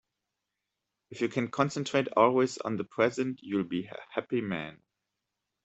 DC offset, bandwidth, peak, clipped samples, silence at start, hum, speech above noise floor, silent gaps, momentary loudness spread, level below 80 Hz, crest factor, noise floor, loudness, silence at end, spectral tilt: under 0.1%; 8.2 kHz; -10 dBFS; under 0.1%; 1.1 s; none; 56 dB; none; 12 LU; -72 dBFS; 22 dB; -86 dBFS; -30 LUFS; 0.9 s; -5.5 dB/octave